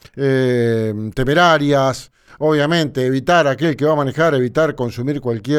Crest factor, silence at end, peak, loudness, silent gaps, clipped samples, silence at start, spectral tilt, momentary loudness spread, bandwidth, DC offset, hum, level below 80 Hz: 14 dB; 0 s; -2 dBFS; -16 LUFS; none; under 0.1%; 0.15 s; -6 dB/octave; 8 LU; 14.5 kHz; under 0.1%; none; -42 dBFS